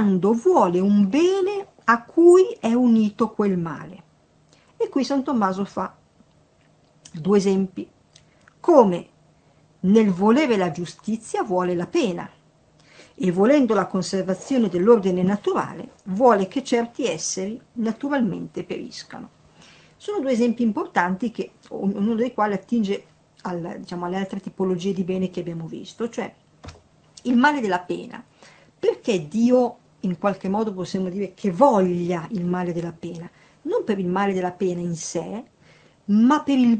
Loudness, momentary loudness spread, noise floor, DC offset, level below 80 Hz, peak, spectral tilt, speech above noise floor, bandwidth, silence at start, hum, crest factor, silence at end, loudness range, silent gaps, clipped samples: -22 LUFS; 15 LU; -58 dBFS; under 0.1%; -62 dBFS; 0 dBFS; -6 dB/octave; 37 dB; 8.8 kHz; 0 s; none; 22 dB; 0 s; 7 LU; none; under 0.1%